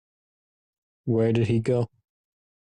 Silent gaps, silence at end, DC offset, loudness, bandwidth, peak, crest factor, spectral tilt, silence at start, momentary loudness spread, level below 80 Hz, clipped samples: none; 0.85 s; under 0.1%; -25 LUFS; 9 kHz; -12 dBFS; 14 dB; -8.5 dB/octave; 1.05 s; 11 LU; -60 dBFS; under 0.1%